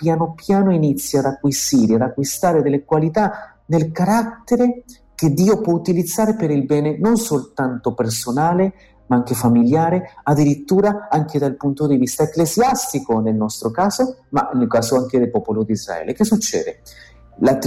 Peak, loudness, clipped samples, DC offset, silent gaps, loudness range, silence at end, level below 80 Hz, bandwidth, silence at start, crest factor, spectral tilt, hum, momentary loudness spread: -6 dBFS; -18 LUFS; under 0.1%; under 0.1%; none; 2 LU; 0 s; -50 dBFS; 16 kHz; 0 s; 12 dB; -6 dB/octave; none; 6 LU